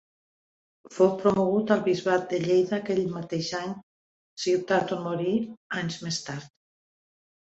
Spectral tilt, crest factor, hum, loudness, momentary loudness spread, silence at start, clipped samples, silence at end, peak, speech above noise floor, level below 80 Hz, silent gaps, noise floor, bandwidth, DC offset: -5.5 dB/octave; 20 dB; none; -26 LUFS; 12 LU; 0.9 s; under 0.1%; 1 s; -8 dBFS; over 64 dB; -66 dBFS; 3.83-4.37 s, 5.57-5.70 s; under -90 dBFS; 8.2 kHz; under 0.1%